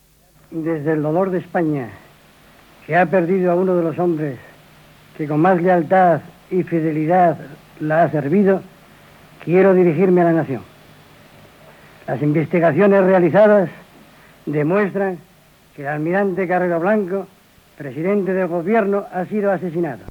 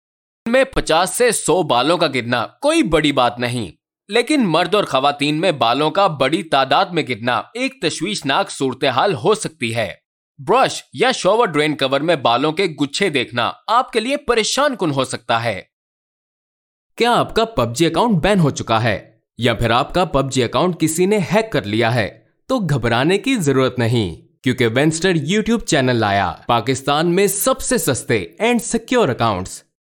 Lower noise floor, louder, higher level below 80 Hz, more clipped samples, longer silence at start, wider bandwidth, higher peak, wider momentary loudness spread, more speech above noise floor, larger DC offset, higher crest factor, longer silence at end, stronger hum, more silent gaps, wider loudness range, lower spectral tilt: second, -52 dBFS vs under -90 dBFS; about the same, -17 LUFS vs -17 LUFS; second, -60 dBFS vs -42 dBFS; neither; about the same, 0.5 s vs 0.45 s; about the same, 19 kHz vs 18 kHz; second, -4 dBFS vs 0 dBFS; first, 14 LU vs 6 LU; second, 36 dB vs over 73 dB; neither; about the same, 14 dB vs 16 dB; second, 0.05 s vs 0.3 s; neither; second, none vs 10.06-10.35 s, 15.73-16.90 s; about the same, 4 LU vs 3 LU; first, -9 dB/octave vs -4.5 dB/octave